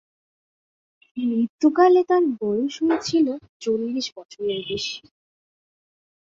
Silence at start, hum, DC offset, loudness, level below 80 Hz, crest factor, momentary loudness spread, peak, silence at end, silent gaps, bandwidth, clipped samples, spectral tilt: 1.15 s; none; under 0.1%; -22 LUFS; -64 dBFS; 20 dB; 14 LU; -4 dBFS; 1.4 s; 1.50-1.59 s, 3.49-3.60 s, 4.12-4.16 s, 4.25-4.29 s; 7.8 kHz; under 0.1%; -4.5 dB/octave